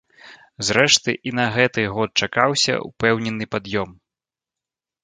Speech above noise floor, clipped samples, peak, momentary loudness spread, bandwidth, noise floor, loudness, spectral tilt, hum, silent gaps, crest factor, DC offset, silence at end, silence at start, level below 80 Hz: 69 dB; under 0.1%; 0 dBFS; 11 LU; 10.5 kHz; -89 dBFS; -19 LUFS; -3 dB/octave; none; none; 22 dB; under 0.1%; 1.1 s; 0.25 s; -54 dBFS